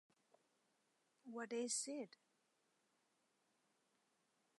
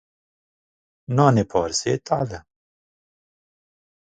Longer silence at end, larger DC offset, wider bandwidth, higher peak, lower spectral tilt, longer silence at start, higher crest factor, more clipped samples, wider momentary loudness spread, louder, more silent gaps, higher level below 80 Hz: first, 2.5 s vs 1.75 s; neither; first, 11 kHz vs 9.4 kHz; second, -30 dBFS vs 0 dBFS; second, -1.5 dB/octave vs -5.5 dB/octave; first, 1.25 s vs 1.1 s; about the same, 24 dB vs 24 dB; neither; first, 14 LU vs 10 LU; second, -46 LUFS vs -21 LUFS; neither; second, under -90 dBFS vs -52 dBFS